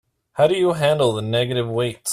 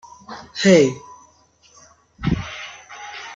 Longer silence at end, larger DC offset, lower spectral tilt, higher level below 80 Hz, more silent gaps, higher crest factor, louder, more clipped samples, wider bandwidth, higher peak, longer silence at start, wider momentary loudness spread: about the same, 0 s vs 0 s; neither; about the same, -5 dB/octave vs -5 dB/octave; second, -56 dBFS vs -44 dBFS; neither; about the same, 16 dB vs 20 dB; about the same, -20 LUFS vs -18 LUFS; neither; first, 14.5 kHz vs 7.8 kHz; about the same, -4 dBFS vs -2 dBFS; about the same, 0.35 s vs 0.3 s; second, 6 LU vs 23 LU